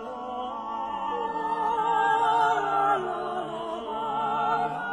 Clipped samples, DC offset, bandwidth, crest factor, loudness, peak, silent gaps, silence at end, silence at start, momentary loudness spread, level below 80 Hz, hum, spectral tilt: under 0.1%; under 0.1%; 10.5 kHz; 14 dB; -27 LUFS; -14 dBFS; none; 0 s; 0 s; 10 LU; -62 dBFS; none; -4.5 dB/octave